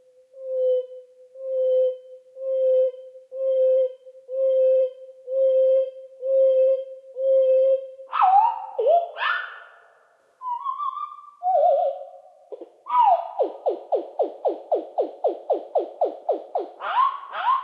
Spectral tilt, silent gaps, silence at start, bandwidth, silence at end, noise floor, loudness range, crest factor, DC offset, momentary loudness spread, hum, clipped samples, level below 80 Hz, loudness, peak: -3 dB/octave; none; 0.35 s; 4.4 kHz; 0 s; -59 dBFS; 6 LU; 16 dB; under 0.1%; 18 LU; none; under 0.1%; under -90 dBFS; -23 LUFS; -8 dBFS